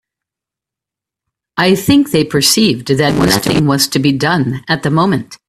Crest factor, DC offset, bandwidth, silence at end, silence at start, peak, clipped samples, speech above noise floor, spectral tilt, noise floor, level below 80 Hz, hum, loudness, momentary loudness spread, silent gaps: 14 dB; under 0.1%; 16 kHz; 0.15 s; 1.55 s; 0 dBFS; under 0.1%; 73 dB; -4.5 dB/octave; -85 dBFS; -42 dBFS; none; -12 LUFS; 5 LU; none